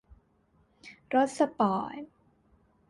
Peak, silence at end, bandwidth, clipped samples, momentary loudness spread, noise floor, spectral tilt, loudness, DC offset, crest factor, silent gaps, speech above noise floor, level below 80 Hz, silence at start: -12 dBFS; 0.85 s; 11.5 kHz; under 0.1%; 24 LU; -68 dBFS; -6 dB/octave; -29 LUFS; under 0.1%; 20 dB; none; 39 dB; -66 dBFS; 0.85 s